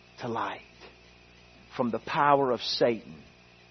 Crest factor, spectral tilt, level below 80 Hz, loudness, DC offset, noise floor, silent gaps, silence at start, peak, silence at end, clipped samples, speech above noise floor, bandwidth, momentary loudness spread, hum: 22 dB; -5.5 dB/octave; -64 dBFS; -28 LUFS; under 0.1%; -55 dBFS; none; 0.2 s; -8 dBFS; 0.5 s; under 0.1%; 28 dB; 6.4 kHz; 18 LU; 60 Hz at -55 dBFS